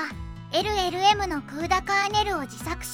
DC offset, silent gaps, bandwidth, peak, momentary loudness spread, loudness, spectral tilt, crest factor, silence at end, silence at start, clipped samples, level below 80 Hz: under 0.1%; none; 17 kHz; -8 dBFS; 11 LU; -25 LUFS; -3.5 dB/octave; 18 dB; 0 s; 0 s; under 0.1%; -42 dBFS